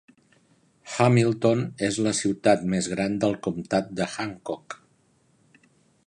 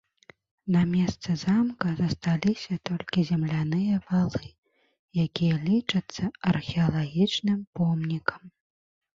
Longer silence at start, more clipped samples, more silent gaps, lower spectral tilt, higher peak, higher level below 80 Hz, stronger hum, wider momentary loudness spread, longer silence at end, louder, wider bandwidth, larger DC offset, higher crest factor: first, 0.85 s vs 0.65 s; neither; second, none vs 4.58-4.63 s, 4.99-5.08 s, 7.67-7.73 s; second, -5.5 dB/octave vs -7 dB/octave; about the same, -6 dBFS vs -8 dBFS; about the same, -60 dBFS vs -56 dBFS; neither; first, 14 LU vs 7 LU; first, 1.35 s vs 0.7 s; about the same, -25 LUFS vs -27 LUFS; first, 11 kHz vs 7.6 kHz; neither; about the same, 20 dB vs 20 dB